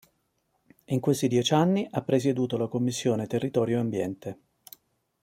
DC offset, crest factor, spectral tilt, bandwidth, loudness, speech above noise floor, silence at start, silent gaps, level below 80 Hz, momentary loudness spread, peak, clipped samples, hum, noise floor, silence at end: under 0.1%; 20 dB; -6 dB/octave; 16.5 kHz; -26 LUFS; 48 dB; 0.9 s; none; -68 dBFS; 9 LU; -8 dBFS; under 0.1%; none; -74 dBFS; 0.9 s